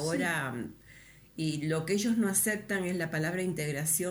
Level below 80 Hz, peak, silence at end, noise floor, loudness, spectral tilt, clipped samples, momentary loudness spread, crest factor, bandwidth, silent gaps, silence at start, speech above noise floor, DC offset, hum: -64 dBFS; -14 dBFS; 0 s; -55 dBFS; -31 LUFS; -4 dB/octave; under 0.1%; 10 LU; 18 dB; over 20 kHz; none; 0 s; 24 dB; under 0.1%; none